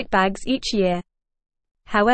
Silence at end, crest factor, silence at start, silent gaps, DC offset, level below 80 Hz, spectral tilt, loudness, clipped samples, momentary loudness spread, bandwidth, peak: 0 s; 18 dB; 0 s; 1.71-1.75 s; under 0.1%; -44 dBFS; -5 dB/octave; -22 LUFS; under 0.1%; 4 LU; 8.8 kHz; -4 dBFS